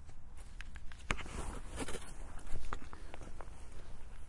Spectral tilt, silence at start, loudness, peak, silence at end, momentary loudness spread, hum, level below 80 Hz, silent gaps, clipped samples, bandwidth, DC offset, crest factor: -4 dB/octave; 0 s; -47 LUFS; -14 dBFS; 0 s; 14 LU; none; -46 dBFS; none; under 0.1%; 11.5 kHz; under 0.1%; 22 dB